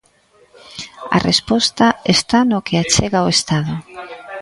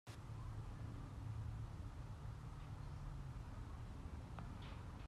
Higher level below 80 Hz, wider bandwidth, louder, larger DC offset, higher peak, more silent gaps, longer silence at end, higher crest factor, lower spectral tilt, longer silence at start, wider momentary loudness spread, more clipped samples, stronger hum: first, -42 dBFS vs -54 dBFS; second, 11.5 kHz vs 13 kHz; first, -15 LUFS vs -52 LUFS; neither; first, 0 dBFS vs -38 dBFS; neither; about the same, 0 s vs 0 s; first, 18 dB vs 12 dB; second, -4 dB/octave vs -7 dB/octave; first, 0.7 s vs 0.05 s; first, 18 LU vs 4 LU; neither; neither